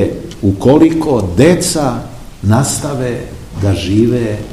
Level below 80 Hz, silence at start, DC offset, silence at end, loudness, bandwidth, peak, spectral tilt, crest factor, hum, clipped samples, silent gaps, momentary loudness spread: -34 dBFS; 0 s; 0.7%; 0 s; -13 LUFS; 15 kHz; 0 dBFS; -6 dB/octave; 12 dB; none; 0.6%; none; 11 LU